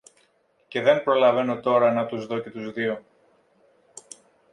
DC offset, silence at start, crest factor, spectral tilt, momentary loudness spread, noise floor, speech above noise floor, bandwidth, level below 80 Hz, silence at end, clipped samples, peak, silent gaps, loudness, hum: under 0.1%; 0.7 s; 20 dB; -5.5 dB/octave; 15 LU; -65 dBFS; 43 dB; 11 kHz; -72 dBFS; 1.55 s; under 0.1%; -4 dBFS; none; -23 LUFS; none